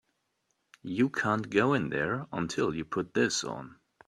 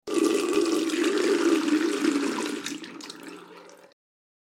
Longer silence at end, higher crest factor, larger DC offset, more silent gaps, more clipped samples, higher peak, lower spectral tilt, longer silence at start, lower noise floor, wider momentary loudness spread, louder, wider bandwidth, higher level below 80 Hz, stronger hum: second, 0.35 s vs 0.75 s; about the same, 20 dB vs 16 dB; neither; neither; neither; about the same, -10 dBFS vs -10 dBFS; first, -4.5 dB/octave vs -3 dB/octave; first, 0.85 s vs 0.05 s; first, -78 dBFS vs -49 dBFS; second, 12 LU vs 17 LU; second, -30 LUFS vs -25 LUFS; second, 12.5 kHz vs 16.5 kHz; first, -64 dBFS vs -76 dBFS; neither